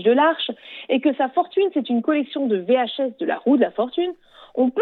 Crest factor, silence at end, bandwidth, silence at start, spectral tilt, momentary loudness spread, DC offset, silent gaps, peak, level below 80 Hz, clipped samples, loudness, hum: 14 dB; 0 s; 4.3 kHz; 0 s; -8 dB/octave; 8 LU; under 0.1%; none; -6 dBFS; -74 dBFS; under 0.1%; -21 LUFS; none